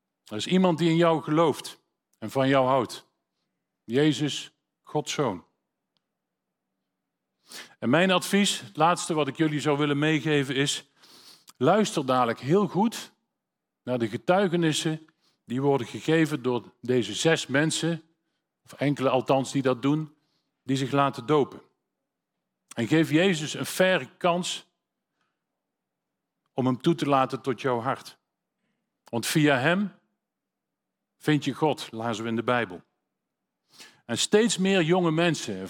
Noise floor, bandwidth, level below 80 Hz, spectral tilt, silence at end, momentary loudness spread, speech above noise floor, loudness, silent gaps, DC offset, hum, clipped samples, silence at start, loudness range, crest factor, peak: -85 dBFS; 17.5 kHz; -74 dBFS; -5 dB/octave; 0 s; 12 LU; 61 dB; -25 LUFS; none; under 0.1%; none; under 0.1%; 0.3 s; 5 LU; 20 dB; -6 dBFS